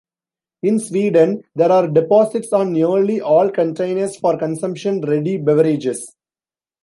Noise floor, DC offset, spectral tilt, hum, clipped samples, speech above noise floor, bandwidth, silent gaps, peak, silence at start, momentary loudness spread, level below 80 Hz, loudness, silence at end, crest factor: under -90 dBFS; under 0.1%; -7 dB/octave; none; under 0.1%; over 74 dB; 11.5 kHz; none; -2 dBFS; 0.65 s; 7 LU; -66 dBFS; -17 LUFS; 0.75 s; 14 dB